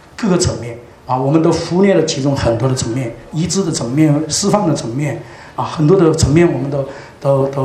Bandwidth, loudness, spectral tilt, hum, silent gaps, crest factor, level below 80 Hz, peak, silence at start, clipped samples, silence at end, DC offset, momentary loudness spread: 13 kHz; -15 LUFS; -5.5 dB/octave; none; none; 14 dB; -38 dBFS; 0 dBFS; 0.2 s; under 0.1%; 0 s; under 0.1%; 12 LU